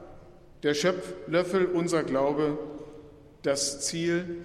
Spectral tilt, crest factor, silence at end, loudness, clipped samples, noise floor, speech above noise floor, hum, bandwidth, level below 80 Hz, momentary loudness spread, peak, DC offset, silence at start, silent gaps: -4 dB/octave; 16 dB; 0 s; -28 LUFS; under 0.1%; -50 dBFS; 23 dB; none; 14 kHz; -58 dBFS; 10 LU; -12 dBFS; under 0.1%; 0 s; none